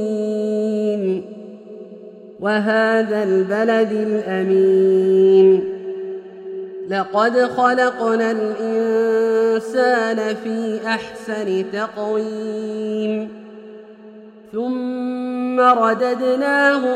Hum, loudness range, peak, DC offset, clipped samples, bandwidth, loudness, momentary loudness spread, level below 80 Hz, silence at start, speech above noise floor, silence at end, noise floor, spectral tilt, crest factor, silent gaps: none; 9 LU; -2 dBFS; under 0.1%; under 0.1%; 9.8 kHz; -18 LUFS; 16 LU; -68 dBFS; 0 s; 23 dB; 0 s; -41 dBFS; -6 dB/octave; 16 dB; none